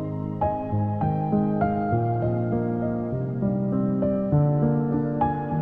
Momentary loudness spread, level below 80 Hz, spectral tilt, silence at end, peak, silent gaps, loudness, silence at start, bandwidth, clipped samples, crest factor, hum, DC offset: 5 LU; -46 dBFS; -12.5 dB/octave; 0 s; -8 dBFS; none; -25 LUFS; 0 s; 3.6 kHz; under 0.1%; 16 dB; none; under 0.1%